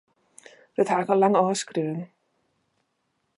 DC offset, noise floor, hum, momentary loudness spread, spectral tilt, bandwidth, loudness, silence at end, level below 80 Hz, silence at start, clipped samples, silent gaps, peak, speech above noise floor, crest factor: under 0.1%; -75 dBFS; none; 15 LU; -5.5 dB/octave; 11.5 kHz; -23 LUFS; 1.3 s; -78 dBFS; 0.8 s; under 0.1%; none; -6 dBFS; 52 dB; 20 dB